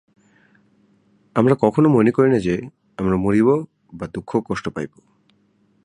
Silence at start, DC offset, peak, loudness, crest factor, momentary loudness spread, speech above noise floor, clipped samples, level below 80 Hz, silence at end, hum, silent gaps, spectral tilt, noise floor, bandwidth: 1.35 s; under 0.1%; -2 dBFS; -19 LUFS; 20 dB; 16 LU; 43 dB; under 0.1%; -48 dBFS; 1 s; none; none; -8.5 dB/octave; -61 dBFS; 11 kHz